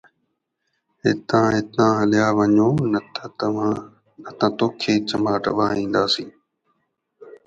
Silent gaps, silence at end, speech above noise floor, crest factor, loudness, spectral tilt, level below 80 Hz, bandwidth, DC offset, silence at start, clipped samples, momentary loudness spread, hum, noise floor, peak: none; 0.1 s; 55 dB; 18 dB; -20 LUFS; -6 dB/octave; -56 dBFS; 8 kHz; under 0.1%; 1.05 s; under 0.1%; 8 LU; none; -74 dBFS; -4 dBFS